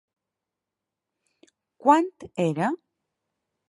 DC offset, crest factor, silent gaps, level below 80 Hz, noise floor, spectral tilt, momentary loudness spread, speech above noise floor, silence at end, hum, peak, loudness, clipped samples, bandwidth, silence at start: under 0.1%; 24 dB; none; -72 dBFS; -87 dBFS; -6.5 dB/octave; 11 LU; 64 dB; 0.95 s; none; -4 dBFS; -24 LUFS; under 0.1%; 11.5 kHz; 1.85 s